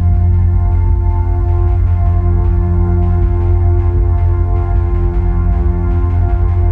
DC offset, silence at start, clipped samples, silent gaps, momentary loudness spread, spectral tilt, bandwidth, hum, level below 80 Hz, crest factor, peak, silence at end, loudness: under 0.1%; 0 s; under 0.1%; none; 2 LU; -11.5 dB/octave; 2.6 kHz; none; -14 dBFS; 8 dB; -4 dBFS; 0 s; -14 LUFS